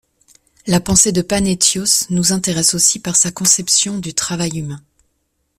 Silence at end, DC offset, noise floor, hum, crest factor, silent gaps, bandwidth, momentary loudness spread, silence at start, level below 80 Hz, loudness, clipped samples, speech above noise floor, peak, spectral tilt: 0.8 s; under 0.1%; -67 dBFS; none; 18 dB; none; 16 kHz; 10 LU; 0.65 s; -42 dBFS; -14 LUFS; under 0.1%; 52 dB; 0 dBFS; -2.5 dB/octave